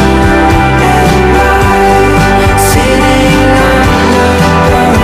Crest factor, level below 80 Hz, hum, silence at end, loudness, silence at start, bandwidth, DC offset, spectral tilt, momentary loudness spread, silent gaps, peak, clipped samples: 6 dB; -16 dBFS; none; 0 s; -7 LUFS; 0 s; 16 kHz; under 0.1%; -5.5 dB/octave; 1 LU; none; 0 dBFS; under 0.1%